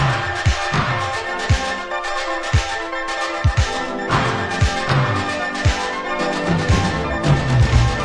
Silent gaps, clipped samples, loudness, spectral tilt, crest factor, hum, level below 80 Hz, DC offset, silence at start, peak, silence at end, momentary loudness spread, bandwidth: none; under 0.1%; -19 LUFS; -5 dB/octave; 16 dB; none; -26 dBFS; under 0.1%; 0 s; -4 dBFS; 0 s; 6 LU; 10.5 kHz